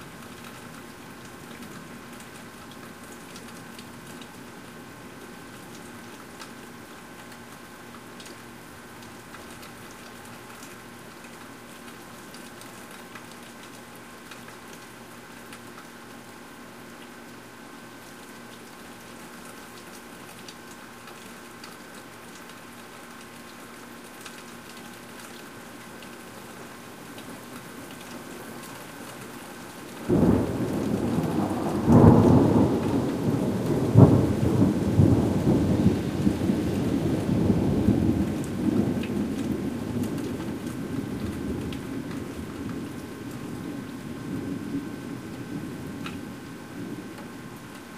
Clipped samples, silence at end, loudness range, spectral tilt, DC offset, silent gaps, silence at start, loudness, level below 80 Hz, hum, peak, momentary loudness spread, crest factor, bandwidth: under 0.1%; 0 s; 21 LU; -7.5 dB/octave; 0.1%; none; 0 s; -25 LUFS; -46 dBFS; none; -2 dBFS; 20 LU; 26 dB; 15.5 kHz